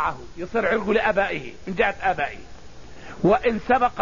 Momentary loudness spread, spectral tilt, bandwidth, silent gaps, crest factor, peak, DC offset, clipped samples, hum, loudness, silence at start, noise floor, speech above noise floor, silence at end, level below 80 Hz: 14 LU; -6 dB/octave; 7.4 kHz; none; 18 dB; -6 dBFS; 1%; under 0.1%; none; -23 LUFS; 0 s; -43 dBFS; 20 dB; 0 s; -44 dBFS